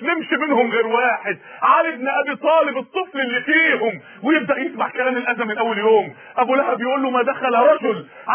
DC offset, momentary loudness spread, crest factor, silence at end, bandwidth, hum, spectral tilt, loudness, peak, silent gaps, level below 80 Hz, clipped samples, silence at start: under 0.1%; 8 LU; 16 dB; 0 s; 3.5 kHz; none; -8 dB/octave; -18 LUFS; -2 dBFS; none; -76 dBFS; under 0.1%; 0 s